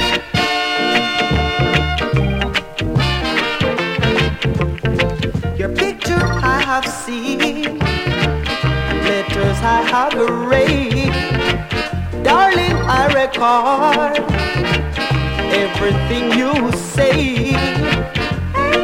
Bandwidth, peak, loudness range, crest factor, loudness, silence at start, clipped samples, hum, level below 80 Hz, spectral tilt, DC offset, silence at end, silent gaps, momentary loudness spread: 16.5 kHz; 0 dBFS; 3 LU; 16 dB; -16 LUFS; 0 s; under 0.1%; none; -28 dBFS; -5.5 dB/octave; under 0.1%; 0 s; none; 5 LU